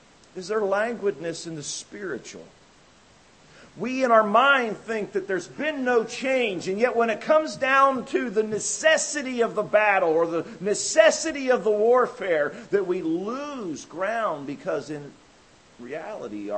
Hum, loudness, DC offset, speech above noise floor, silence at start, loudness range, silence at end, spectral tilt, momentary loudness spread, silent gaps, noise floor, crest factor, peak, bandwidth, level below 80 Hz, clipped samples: none; -24 LUFS; under 0.1%; 31 dB; 0.35 s; 9 LU; 0 s; -3 dB/octave; 15 LU; none; -55 dBFS; 20 dB; -4 dBFS; 8.8 kHz; -68 dBFS; under 0.1%